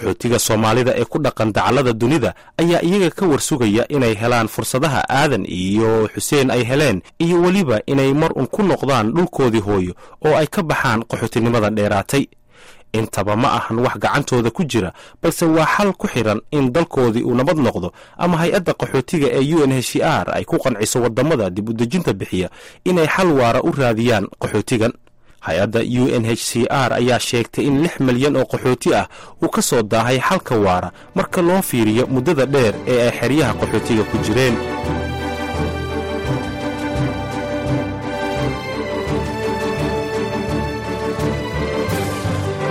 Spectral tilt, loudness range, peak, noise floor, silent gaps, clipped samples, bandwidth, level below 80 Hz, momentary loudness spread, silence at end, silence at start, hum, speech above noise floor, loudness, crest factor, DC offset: -5.5 dB/octave; 5 LU; -6 dBFS; -44 dBFS; none; under 0.1%; 16 kHz; -40 dBFS; 7 LU; 0 s; 0 s; none; 27 dB; -18 LUFS; 12 dB; 0.5%